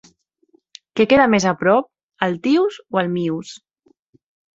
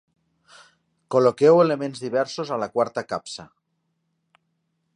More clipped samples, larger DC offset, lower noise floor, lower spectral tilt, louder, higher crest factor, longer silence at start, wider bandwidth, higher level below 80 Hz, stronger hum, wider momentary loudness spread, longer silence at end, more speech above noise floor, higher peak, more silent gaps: neither; neither; second, -60 dBFS vs -74 dBFS; about the same, -5.5 dB/octave vs -6 dB/octave; first, -18 LUFS vs -22 LUFS; about the same, 20 dB vs 20 dB; second, 0.95 s vs 1.1 s; second, 8 kHz vs 10.5 kHz; first, -56 dBFS vs -70 dBFS; neither; about the same, 15 LU vs 15 LU; second, 1 s vs 1.5 s; second, 43 dB vs 53 dB; first, 0 dBFS vs -4 dBFS; first, 2.03-2.08 s vs none